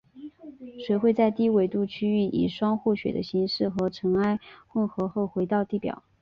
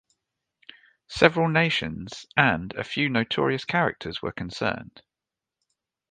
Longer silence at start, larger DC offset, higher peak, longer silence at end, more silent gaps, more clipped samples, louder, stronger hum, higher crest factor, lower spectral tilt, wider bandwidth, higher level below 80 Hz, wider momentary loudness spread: second, 0.15 s vs 1.1 s; neither; second, -10 dBFS vs 0 dBFS; second, 0.25 s vs 1.3 s; neither; neither; about the same, -26 LUFS vs -24 LUFS; neither; second, 16 dB vs 26 dB; first, -8.5 dB/octave vs -5.5 dB/octave; second, 6.4 kHz vs 9.6 kHz; second, -60 dBFS vs -54 dBFS; about the same, 13 LU vs 12 LU